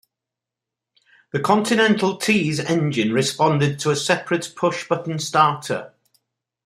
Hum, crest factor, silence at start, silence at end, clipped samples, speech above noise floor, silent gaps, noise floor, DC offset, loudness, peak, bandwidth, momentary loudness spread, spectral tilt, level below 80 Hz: none; 18 dB; 1.35 s; 0.8 s; under 0.1%; 66 dB; none; -86 dBFS; under 0.1%; -20 LUFS; -2 dBFS; 15.5 kHz; 8 LU; -4.5 dB/octave; -64 dBFS